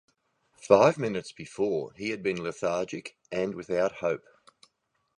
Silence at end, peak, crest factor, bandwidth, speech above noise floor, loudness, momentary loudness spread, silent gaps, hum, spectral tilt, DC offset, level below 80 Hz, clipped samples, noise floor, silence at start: 1 s; -6 dBFS; 24 dB; 11 kHz; 48 dB; -28 LUFS; 15 LU; none; none; -5.5 dB/octave; under 0.1%; -66 dBFS; under 0.1%; -76 dBFS; 0.6 s